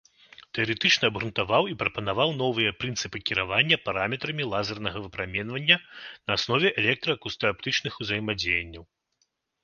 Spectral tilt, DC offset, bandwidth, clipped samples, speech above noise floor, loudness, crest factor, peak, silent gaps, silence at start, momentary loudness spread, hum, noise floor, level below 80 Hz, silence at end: -4 dB/octave; under 0.1%; 10 kHz; under 0.1%; 47 dB; -25 LUFS; 24 dB; -4 dBFS; none; 0.55 s; 9 LU; none; -74 dBFS; -54 dBFS; 0.8 s